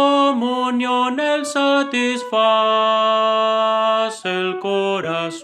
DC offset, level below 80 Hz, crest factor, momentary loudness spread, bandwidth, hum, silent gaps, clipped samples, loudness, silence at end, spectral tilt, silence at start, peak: under 0.1%; -76 dBFS; 14 dB; 6 LU; 12.5 kHz; none; none; under 0.1%; -18 LUFS; 0 s; -3.5 dB/octave; 0 s; -4 dBFS